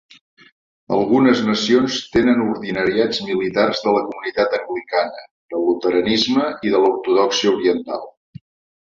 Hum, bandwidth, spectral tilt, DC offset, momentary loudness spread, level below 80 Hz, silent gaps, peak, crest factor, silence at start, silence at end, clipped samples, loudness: none; 7.6 kHz; -4.5 dB/octave; under 0.1%; 8 LU; -54 dBFS; 5.31-5.49 s; -2 dBFS; 16 dB; 0.9 s; 0.7 s; under 0.1%; -18 LUFS